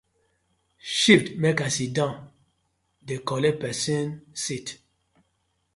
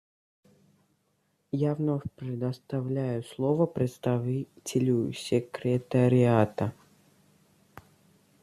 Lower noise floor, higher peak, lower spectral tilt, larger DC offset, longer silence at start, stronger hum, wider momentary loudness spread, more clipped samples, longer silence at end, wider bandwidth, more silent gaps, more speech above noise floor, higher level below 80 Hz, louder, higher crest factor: about the same, -73 dBFS vs -73 dBFS; first, -2 dBFS vs -8 dBFS; second, -4 dB/octave vs -7.5 dB/octave; neither; second, 0.85 s vs 1.55 s; neither; first, 17 LU vs 10 LU; neither; second, 1 s vs 1.7 s; second, 11.5 kHz vs 14 kHz; neither; about the same, 48 dB vs 46 dB; about the same, -62 dBFS vs -66 dBFS; first, -24 LUFS vs -28 LUFS; first, 26 dB vs 20 dB